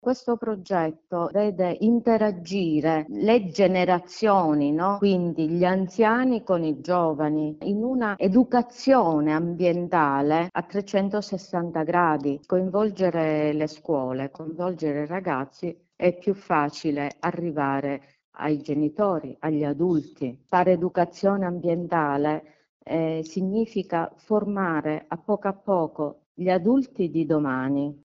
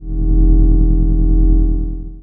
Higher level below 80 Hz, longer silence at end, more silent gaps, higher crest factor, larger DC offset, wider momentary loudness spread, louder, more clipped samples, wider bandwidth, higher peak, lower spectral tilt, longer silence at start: second, -62 dBFS vs -12 dBFS; about the same, 0.1 s vs 0 s; first, 18.24-18.32 s, 22.69-22.80 s, 26.26-26.35 s vs none; first, 18 dB vs 10 dB; neither; about the same, 8 LU vs 7 LU; second, -24 LUFS vs -16 LUFS; neither; first, 7.6 kHz vs 1.2 kHz; second, -6 dBFS vs -2 dBFS; second, -7.5 dB/octave vs -15.5 dB/octave; about the same, 0.05 s vs 0 s